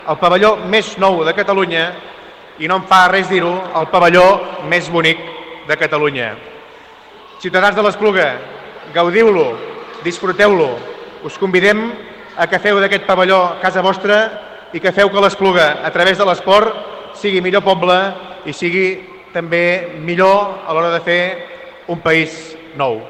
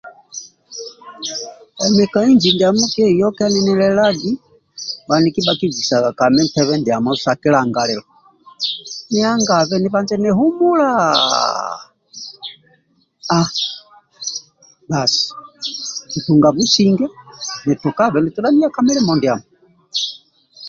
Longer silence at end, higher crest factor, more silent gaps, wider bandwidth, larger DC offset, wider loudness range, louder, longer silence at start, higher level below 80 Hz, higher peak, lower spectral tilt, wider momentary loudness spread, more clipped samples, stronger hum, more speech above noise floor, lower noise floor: about the same, 0 s vs 0 s; about the same, 14 dB vs 16 dB; neither; first, 13.5 kHz vs 7.6 kHz; neither; second, 3 LU vs 6 LU; first, -13 LUFS vs -16 LUFS; about the same, 0 s vs 0.05 s; about the same, -52 dBFS vs -54 dBFS; about the same, 0 dBFS vs 0 dBFS; about the same, -5 dB/octave vs -4.5 dB/octave; about the same, 17 LU vs 17 LU; neither; neither; second, 25 dB vs 43 dB; second, -39 dBFS vs -58 dBFS